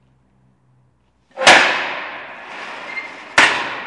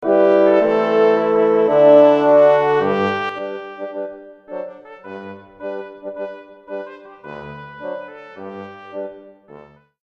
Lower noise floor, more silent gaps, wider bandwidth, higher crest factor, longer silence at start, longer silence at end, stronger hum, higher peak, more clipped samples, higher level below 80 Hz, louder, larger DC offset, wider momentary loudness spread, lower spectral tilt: first, -59 dBFS vs -44 dBFS; neither; first, 12 kHz vs 6.2 kHz; about the same, 18 dB vs 18 dB; first, 1.35 s vs 0 s; second, 0 s vs 0.45 s; neither; about the same, 0 dBFS vs 0 dBFS; neither; about the same, -60 dBFS vs -64 dBFS; about the same, -13 LUFS vs -14 LUFS; neither; about the same, 21 LU vs 23 LU; second, -1 dB/octave vs -7.5 dB/octave